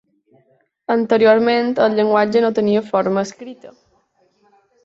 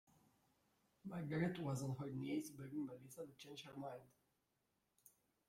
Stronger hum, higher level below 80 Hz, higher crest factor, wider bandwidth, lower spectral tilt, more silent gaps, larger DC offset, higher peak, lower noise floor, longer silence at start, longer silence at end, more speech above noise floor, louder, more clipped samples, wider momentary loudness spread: neither; first, -64 dBFS vs -80 dBFS; about the same, 16 dB vs 20 dB; second, 7.8 kHz vs 16.5 kHz; about the same, -6 dB/octave vs -6.5 dB/octave; neither; neither; first, -2 dBFS vs -28 dBFS; second, -61 dBFS vs -86 dBFS; second, 0.9 s vs 1.05 s; first, 1.15 s vs 0.4 s; first, 45 dB vs 40 dB; first, -16 LUFS vs -47 LUFS; neither; about the same, 15 LU vs 13 LU